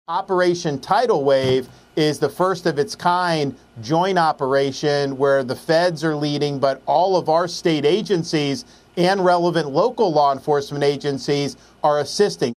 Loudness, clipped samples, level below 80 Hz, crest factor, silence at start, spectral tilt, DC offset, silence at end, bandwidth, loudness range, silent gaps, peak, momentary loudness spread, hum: -19 LUFS; under 0.1%; -58 dBFS; 16 dB; 0.1 s; -5.5 dB/octave; under 0.1%; 0.05 s; 15 kHz; 1 LU; none; -4 dBFS; 6 LU; none